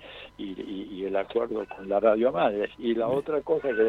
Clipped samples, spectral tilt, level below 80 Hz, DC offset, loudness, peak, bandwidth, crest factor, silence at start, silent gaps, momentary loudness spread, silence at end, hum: under 0.1%; -7.5 dB/octave; -60 dBFS; under 0.1%; -27 LUFS; -8 dBFS; 6 kHz; 18 dB; 0 s; none; 14 LU; 0 s; 50 Hz at -60 dBFS